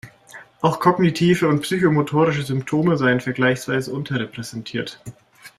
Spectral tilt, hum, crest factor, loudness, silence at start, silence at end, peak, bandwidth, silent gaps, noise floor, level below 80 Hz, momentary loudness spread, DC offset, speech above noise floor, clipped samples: -6.5 dB/octave; none; 18 dB; -20 LUFS; 0.05 s; 0.1 s; -2 dBFS; 14.5 kHz; none; -44 dBFS; -56 dBFS; 12 LU; under 0.1%; 25 dB; under 0.1%